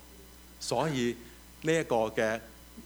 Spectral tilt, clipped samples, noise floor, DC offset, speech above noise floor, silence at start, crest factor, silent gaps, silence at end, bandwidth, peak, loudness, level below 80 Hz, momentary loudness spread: -4.5 dB/octave; under 0.1%; -52 dBFS; under 0.1%; 22 dB; 0 s; 18 dB; none; 0 s; over 20 kHz; -14 dBFS; -31 LUFS; -56 dBFS; 23 LU